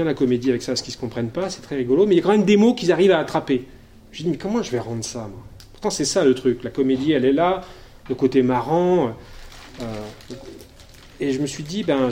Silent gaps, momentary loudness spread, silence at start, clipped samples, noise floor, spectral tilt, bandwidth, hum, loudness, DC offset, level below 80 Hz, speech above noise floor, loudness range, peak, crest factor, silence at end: none; 18 LU; 0 s; under 0.1%; -45 dBFS; -5.5 dB/octave; 15.5 kHz; none; -20 LUFS; under 0.1%; -48 dBFS; 25 dB; 6 LU; -4 dBFS; 16 dB; 0 s